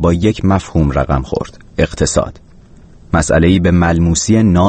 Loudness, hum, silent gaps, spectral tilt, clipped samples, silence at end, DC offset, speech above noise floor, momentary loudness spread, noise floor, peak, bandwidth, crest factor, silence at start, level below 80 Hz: -14 LUFS; none; none; -6 dB/octave; under 0.1%; 0 s; under 0.1%; 28 dB; 8 LU; -40 dBFS; 0 dBFS; 8.8 kHz; 12 dB; 0 s; -26 dBFS